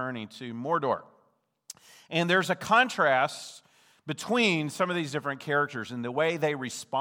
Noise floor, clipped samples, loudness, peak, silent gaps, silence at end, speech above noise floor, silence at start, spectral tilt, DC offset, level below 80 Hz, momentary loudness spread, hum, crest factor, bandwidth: -70 dBFS; under 0.1%; -27 LUFS; -10 dBFS; none; 0 s; 42 dB; 0 s; -4.5 dB/octave; under 0.1%; -78 dBFS; 17 LU; none; 20 dB; 19.5 kHz